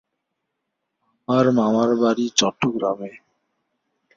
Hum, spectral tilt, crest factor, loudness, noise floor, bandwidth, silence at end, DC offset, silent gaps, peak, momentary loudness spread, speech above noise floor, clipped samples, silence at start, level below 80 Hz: none; -4.5 dB/octave; 20 dB; -20 LUFS; -78 dBFS; 7.6 kHz; 1 s; under 0.1%; none; -2 dBFS; 13 LU; 59 dB; under 0.1%; 1.3 s; -64 dBFS